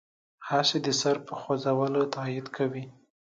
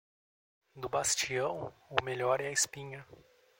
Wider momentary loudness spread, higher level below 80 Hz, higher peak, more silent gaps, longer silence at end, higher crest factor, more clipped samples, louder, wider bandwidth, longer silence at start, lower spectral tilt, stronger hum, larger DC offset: second, 11 LU vs 15 LU; second, -74 dBFS vs -68 dBFS; second, -10 dBFS vs -6 dBFS; neither; about the same, 0.35 s vs 0.45 s; second, 18 dB vs 30 dB; neither; first, -28 LUFS vs -33 LUFS; second, 9.4 kHz vs 16.5 kHz; second, 0.4 s vs 0.75 s; first, -4 dB/octave vs -2 dB/octave; neither; neither